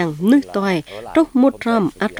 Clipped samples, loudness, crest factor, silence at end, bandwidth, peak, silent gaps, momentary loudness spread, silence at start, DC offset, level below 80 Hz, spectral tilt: under 0.1%; -17 LUFS; 14 dB; 0 s; 14.5 kHz; -2 dBFS; none; 5 LU; 0 s; under 0.1%; -50 dBFS; -7 dB/octave